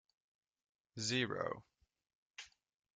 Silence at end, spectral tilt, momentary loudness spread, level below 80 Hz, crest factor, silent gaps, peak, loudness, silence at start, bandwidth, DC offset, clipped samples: 0.5 s; -3.5 dB/octave; 20 LU; -78 dBFS; 24 dB; 2.15-2.34 s; -22 dBFS; -40 LUFS; 0.95 s; 9.6 kHz; under 0.1%; under 0.1%